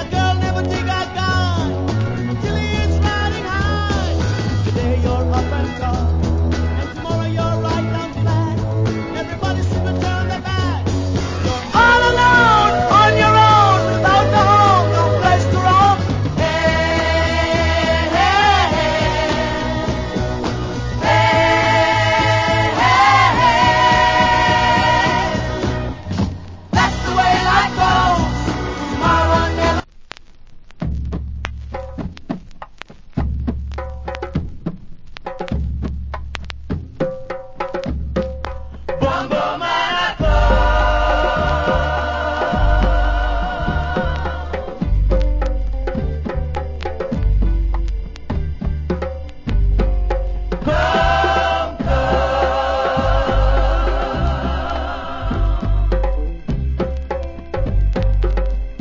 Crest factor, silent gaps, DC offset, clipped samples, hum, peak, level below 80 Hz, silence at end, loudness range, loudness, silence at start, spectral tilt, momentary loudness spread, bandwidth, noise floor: 16 dB; none; under 0.1%; under 0.1%; none; 0 dBFS; -22 dBFS; 0 s; 13 LU; -17 LUFS; 0 s; -5.5 dB/octave; 14 LU; 7.6 kHz; -38 dBFS